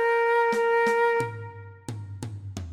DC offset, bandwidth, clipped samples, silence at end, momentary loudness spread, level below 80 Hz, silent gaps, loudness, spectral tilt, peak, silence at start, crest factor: under 0.1%; 13 kHz; under 0.1%; 0 s; 17 LU; -58 dBFS; none; -23 LUFS; -5.5 dB/octave; -14 dBFS; 0 s; 12 dB